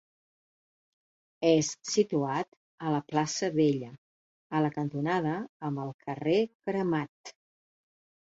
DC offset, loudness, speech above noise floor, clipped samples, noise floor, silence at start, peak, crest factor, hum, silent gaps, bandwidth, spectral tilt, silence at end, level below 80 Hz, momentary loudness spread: under 0.1%; -30 LUFS; over 61 dB; under 0.1%; under -90 dBFS; 1.4 s; -12 dBFS; 20 dB; none; 2.48-2.78 s, 3.98-4.50 s, 5.49-5.60 s, 5.94-5.99 s, 6.55-6.60 s, 7.09-7.24 s; 8 kHz; -5.5 dB/octave; 0.95 s; -72 dBFS; 11 LU